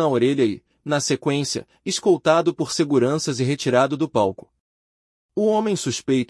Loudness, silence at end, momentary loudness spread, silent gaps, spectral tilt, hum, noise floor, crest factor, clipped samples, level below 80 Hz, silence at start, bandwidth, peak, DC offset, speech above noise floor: -21 LUFS; 0.05 s; 8 LU; 4.60-5.29 s; -5 dB/octave; none; under -90 dBFS; 16 dB; under 0.1%; -64 dBFS; 0 s; 12 kHz; -4 dBFS; under 0.1%; over 70 dB